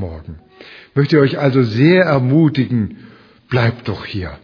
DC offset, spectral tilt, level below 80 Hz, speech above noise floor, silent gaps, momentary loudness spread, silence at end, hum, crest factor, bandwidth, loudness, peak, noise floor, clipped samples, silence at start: under 0.1%; -9 dB/octave; -44 dBFS; 26 dB; none; 13 LU; 0.05 s; none; 16 dB; 5.4 kHz; -15 LUFS; 0 dBFS; -41 dBFS; under 0.1%; 0 s